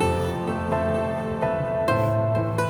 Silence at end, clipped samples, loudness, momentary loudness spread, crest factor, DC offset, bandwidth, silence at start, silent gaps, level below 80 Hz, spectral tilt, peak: 0 s; under 0.1%; -24 LUFS; 4 LU; 14 dB; under 0.1%; 19 kHz; 0 s; none; -44 dBFS; -7 dB/octave; -10 dBFS